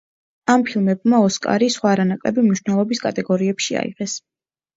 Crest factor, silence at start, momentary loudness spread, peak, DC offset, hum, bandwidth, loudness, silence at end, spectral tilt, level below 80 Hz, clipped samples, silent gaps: 18 dB; 0.5 s; 9 LU; 0 dBFS; under 0.1%; none; 8 kHz; -19 LUFS; 0.6 s; -5 dB/octave; -62 dBFS; under 0.1%; none